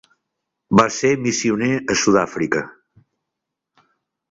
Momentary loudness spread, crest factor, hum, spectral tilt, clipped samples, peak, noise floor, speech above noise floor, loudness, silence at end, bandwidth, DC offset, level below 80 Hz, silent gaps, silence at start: 6 LU; 20 dB; none; -4.5 dB/octave; under 0.1%; 0 dBFS; -82 dBFS; 64 dB; -18 LUFS; 1.6 s; 8 kHz; under 0.1%; -56 dBFS; none; 0.7 s